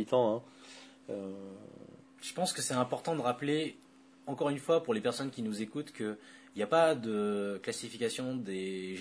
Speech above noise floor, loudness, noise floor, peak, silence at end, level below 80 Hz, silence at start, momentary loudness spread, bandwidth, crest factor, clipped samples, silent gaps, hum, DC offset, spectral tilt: 21 dB; -34 LUFS; -54 dBFS; -14 dBFS; 0 s; -80 dBFS; 0 s; 19 LU; 11 kHz; 20 dB; under 0.1%; none; none; under 0.1%; -4.5 dB/octave